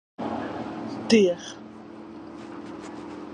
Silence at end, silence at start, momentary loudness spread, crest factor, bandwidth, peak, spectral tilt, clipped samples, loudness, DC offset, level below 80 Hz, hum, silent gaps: 0 s; 0.2 s; 22 LU; 22 dB; 10 kHz; -6 dBFS; -5 dB/octave; under 0.1%; -25 LUFS; under 0.1%; -62 dBFS; none; none